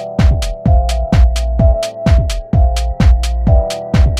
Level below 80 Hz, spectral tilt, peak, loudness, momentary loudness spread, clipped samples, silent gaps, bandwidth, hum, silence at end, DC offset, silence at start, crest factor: -12 dBFS; -6.5 dB/octave; 0 dBFS; -14 LUFS; 3 LU; under 0.1%; none; 11 kHz; none; 0 s; under 0.1%; 0 s; 10 dB